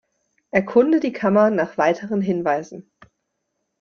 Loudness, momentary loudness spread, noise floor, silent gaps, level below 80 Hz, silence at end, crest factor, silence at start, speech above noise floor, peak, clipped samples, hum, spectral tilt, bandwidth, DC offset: -20 LUFS; 7 LU; -76 dBFS; none; -62 dBFS; 1 s; 18 dB; 0.55 s; 57 dB; -2 dBFS; under 0.1%; none; -7.5 dB/octave; 7 kHz; under 0.1%